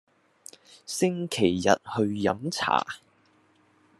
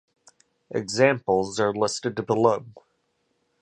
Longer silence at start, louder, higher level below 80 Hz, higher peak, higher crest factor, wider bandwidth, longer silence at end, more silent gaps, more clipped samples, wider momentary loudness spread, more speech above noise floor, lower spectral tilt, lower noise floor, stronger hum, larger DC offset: first, 0.9 s vs 0.7 s; about the same, -26 LUFS vs -24 LUFS; second, -70 dBFS vs -62 dBFS; about the same, -4 dBFS vs -4 dBFS; about the same, 24 dB vs 22 dB; first, 13 kHz vs 11.5 kHz; first, 1.05 s vs 0.85 s; neither; neither; first, 22 LU vs 10 LU; second, 37 dB vs 49 dB; about the same, -4.5 dB/octave vs -4.5 dB/octave; second, -63 dBFS vs -72 dBFS; neither; neither